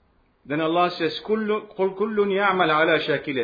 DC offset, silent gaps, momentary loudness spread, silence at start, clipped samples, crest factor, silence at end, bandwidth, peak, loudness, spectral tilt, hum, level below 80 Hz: under 0.1%; none; 8 LU; 0.5 s; under 0.1%; 16 dB; 0 s; 5 kHz; -6 dBFS; -22 LUFS; -7 dB/octave; none; -62 dBFS